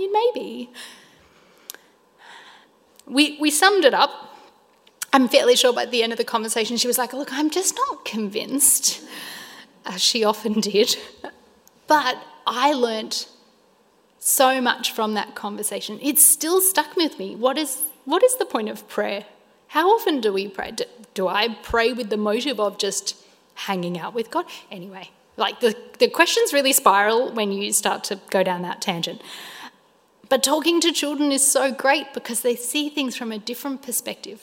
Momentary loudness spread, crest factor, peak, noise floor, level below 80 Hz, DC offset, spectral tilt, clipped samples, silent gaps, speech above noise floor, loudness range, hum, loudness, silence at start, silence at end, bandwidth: 18 LU; 22 dB; 0 dBFS; -59 dBFS; -60 dBFS; under 0.1%; -1.5 dB/octave; under 0.1%; none; 37 dB; 5 LU; none; -20 LUFS; 0 s; 0.05 s; 16.5 kHz